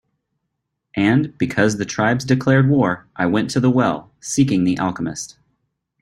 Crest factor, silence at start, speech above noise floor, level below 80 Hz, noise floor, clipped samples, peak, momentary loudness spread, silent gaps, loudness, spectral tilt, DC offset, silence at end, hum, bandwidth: 18 dB; 0.95 s; 59 dB; -52 dBFS; -76 dBFS; under 0.1%; -2 dBFS; 11 LU; none; -18 LUFS; -6 dB/octave; under 0.1%; 0.75 s; none; 12.5 kHz